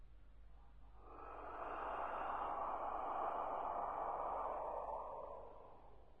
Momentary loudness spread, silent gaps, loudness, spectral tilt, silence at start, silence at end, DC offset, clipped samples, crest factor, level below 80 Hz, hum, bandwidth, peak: 21 LU; none; -45 LUFS; -7 dB/octave; 0 s; 0 s; under 0.1%; under 0.1%; 14 dB; -64 dBFS; none; 11 kHz; -30 dBFS